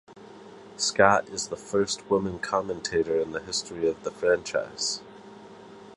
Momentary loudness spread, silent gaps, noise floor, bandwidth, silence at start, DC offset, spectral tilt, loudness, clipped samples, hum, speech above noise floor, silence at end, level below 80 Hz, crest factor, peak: 26 LU; none; -47 dBFS; 11.5 kHz; 0.1 s; under 0.1%; -3 dB/octave; -27 LUFS; under 0.1%; none; 20 dB; 0 s; -58 dBFS; 26 dB; -2 dBFS